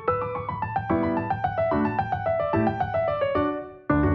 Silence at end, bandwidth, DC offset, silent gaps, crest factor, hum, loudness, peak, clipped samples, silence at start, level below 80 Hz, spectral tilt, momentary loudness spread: 0 s; 5.8 kHz; under 0.1%; none; 14 dB; none; -26 LUFS; -10 dBFS; under 0.1%; 0 s; -44 dBFS; -10 dB/octave; 5 LU